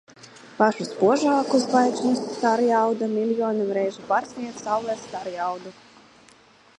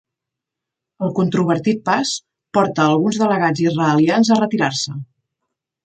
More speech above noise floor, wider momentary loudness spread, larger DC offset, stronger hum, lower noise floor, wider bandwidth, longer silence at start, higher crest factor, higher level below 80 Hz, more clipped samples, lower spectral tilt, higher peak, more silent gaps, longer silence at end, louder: second, 31 dB vs 67 dB; first, 12 LU vs 9 LU; neither; neither; second, -54 dBFS vs -83 dBFS; first, 11 kHz vs 9.2 kHz; second, 0.25 s vs 1 s; about the same, 20 dB vs 16 dB; second, -72 dBFS vs -62 dBFS; neither; about the same, -5 dB/octave vs -5.5 dB/octave; about the same, -4 dBFS vs -2 dBFS; neither; first, 1.05 s vs 0.8 s; second, -23 LUFS vs -17 LUFS